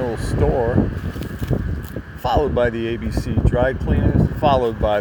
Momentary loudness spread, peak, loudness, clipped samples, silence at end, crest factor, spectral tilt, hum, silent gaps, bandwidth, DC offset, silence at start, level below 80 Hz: 10 LU; -2 dBFS; -20 LUFS; under 0.1%; 0 s; 18 dB; -8 dB/octave; none; none; over 20 kHz; under 0.1%; 0 s; -26 dBFS